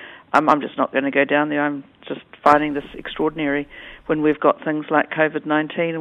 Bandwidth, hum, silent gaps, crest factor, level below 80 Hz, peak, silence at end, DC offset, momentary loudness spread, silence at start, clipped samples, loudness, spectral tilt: 9.4 kHz; none; none; 20 dB; -54 dBFS; 0 dBFS; 0 s; under 0.1%; 16 LU; 0 s; under 0.1%; -20 LUFS; -6.5 dB/octave